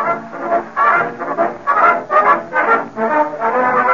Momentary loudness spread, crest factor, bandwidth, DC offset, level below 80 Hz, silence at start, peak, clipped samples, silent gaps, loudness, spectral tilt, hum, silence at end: 7 LU; 14 dB; 7.2 kHz; 0.4%; -60 dBFS; 0 s; -2 dBFS; under 0.1%; none; -15 LUFS; -3 dB/octave; none; 0 s